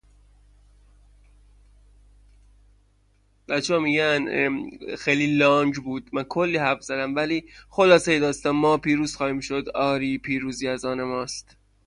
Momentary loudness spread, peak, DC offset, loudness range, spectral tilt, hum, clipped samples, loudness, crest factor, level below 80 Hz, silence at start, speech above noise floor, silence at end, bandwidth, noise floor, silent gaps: 11 LU; -4 dBFS; under 0.1%; 5 LU; -5 dB/octave; 50 Hz at -55 dBFS; under 0.1%; -23 LUFS; 20 dB; -54 dBFS; 3.5 s; 39 dB; 0.45 s; 11 kHz; -62 dBFS; none